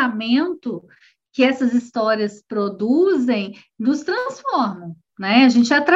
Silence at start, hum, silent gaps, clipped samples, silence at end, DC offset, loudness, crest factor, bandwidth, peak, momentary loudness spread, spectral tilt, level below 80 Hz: 0 s; none; none; under 0.1%; 0 s; under 0.1%; -19 LUFS; 16 dB; 7.8 kHz; -2 dBFS; 16 LU; -5 dB/octave; -68 dBFS